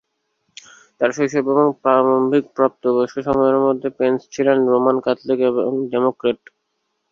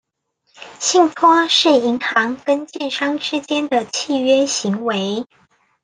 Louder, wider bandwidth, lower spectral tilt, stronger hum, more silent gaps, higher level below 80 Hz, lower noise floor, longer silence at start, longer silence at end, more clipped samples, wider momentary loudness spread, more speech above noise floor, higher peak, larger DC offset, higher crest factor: about the same, -18 LUFS vs -17 LUFS; second, 7.4 kHz vs 10 kHz; first, -6.5 dB/octave vs -2.5 dB/octave; neither; neither; first, -58 dBFS vs -68 dBFS; first, -72 dBFS vs -67 dBFS; first, 1 s vs 0.6 s; first, 0.75 s vs 0.6 s; neither; second, 5 LU vs 9 LU; first, 55 dB vs 50 dB; about the same, -2 dBFS vs 0 dBFS; neither; about the same, 16 dB vs 18 dB